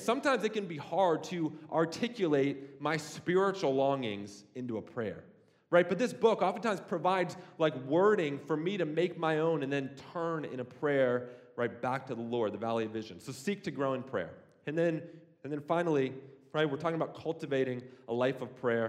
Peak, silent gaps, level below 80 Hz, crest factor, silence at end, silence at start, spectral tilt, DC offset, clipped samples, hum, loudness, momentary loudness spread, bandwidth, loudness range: -12 dBFS; none; -80 dBFS; 20 dB; 0 s; 0 s; -6 dB/octave; under 0.1%; under 0.1%; none; -33 LUFS; 11 LU; 14.5 kHz; 5 LU